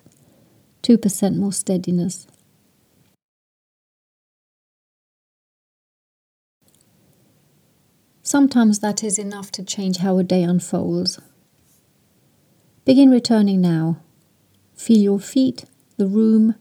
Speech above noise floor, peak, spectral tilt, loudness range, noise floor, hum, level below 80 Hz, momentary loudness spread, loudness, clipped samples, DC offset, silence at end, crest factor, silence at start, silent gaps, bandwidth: 43 dB; -2 dBFS; -5.5 dB/octave; 8 LU; -60 dBFS; none; -68 dBFS; 14 LU; -18 LUFS; under 0.1%; under 0.1%; 0.1 s; 18 dB; 0.85 s; 3.23-6.61 s; 15 kHz